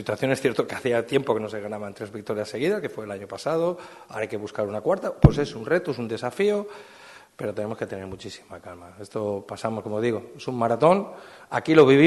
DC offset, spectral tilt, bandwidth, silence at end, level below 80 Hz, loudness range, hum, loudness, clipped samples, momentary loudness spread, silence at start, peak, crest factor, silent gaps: under 0.1%; -7 dB/octave; 12.5 kHz; 0 s; -42 dBFS; 6 LU; none; -25 LUFS; under 0.1%; 18 LU; 0 s; -2 dBFS; 22 dB; none